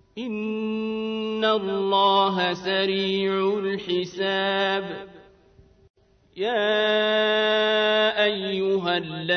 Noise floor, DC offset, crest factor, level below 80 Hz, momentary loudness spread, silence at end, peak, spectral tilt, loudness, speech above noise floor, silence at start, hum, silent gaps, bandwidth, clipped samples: -55 dBFS; under 0.1%; 16 dB; -64 dBFS; 8 LU; 0 s; -8 dBFS; -5.5 dB/octave; -23 LUFS; 32 dB; 0.15 s; none; 5.90-5.94 s; 6.6 kHz; under 0.1%